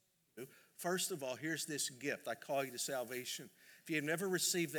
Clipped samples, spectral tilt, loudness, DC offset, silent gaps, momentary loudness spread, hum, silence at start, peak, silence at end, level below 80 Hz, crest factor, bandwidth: under 0.1%; -2.5 dB/octave; -40 LUFS; under 0.1%; none; 19 LU; none; 0.35 s; -22 dBFS; 0 s; under -90 dBFS; 18 dB; over 20 kHz